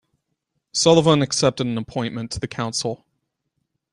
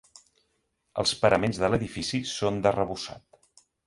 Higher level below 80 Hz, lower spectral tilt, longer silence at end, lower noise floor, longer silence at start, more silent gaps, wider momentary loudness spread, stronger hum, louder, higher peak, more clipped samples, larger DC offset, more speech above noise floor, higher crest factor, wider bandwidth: about the same, -52 dBFS vs -52 dBFS; about the same, -4.5 dB/octave vs -4.5 dB/octave; first, 1 s vs 0.7 s; about the same, -76 dBFS vs -75 dBFS; second, 0.75 s vs 0.95 s; neither; about the same, 13 LU vs 11 LU; neither; first, -20 LUFS vs -27 LUFS; first, -2 dBFS vs -8 dBFS; neither; neither; first, 56 dB vs 48 dB; about the same, 20 dB vs 22 dB; about the same, 11.5 kHz vs 11.5 kHz